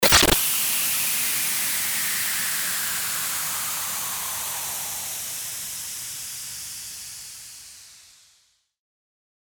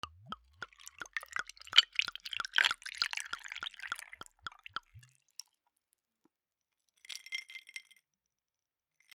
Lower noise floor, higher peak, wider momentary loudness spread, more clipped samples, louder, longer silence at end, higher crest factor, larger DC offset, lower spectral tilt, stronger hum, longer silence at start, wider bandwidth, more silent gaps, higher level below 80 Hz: second, -64 dBFS vs under -90 dBFS; first, -2 dBFS vs -6 dBFS; second, 15 LU vs 23 LU; neither; first, -23 LUFS vs -33 LUFS; first, 1.55 s vs 1.35 s; second, 24 dB vs 34 dB; neither; first, -0.5 dB/octave vs 1.5 dB/octave; neither; about the same, 0 s vs 0.05 s; about the same, over 20 kHz vs 20 kHz; neither; first, -46 dBFS vs -74 dBFS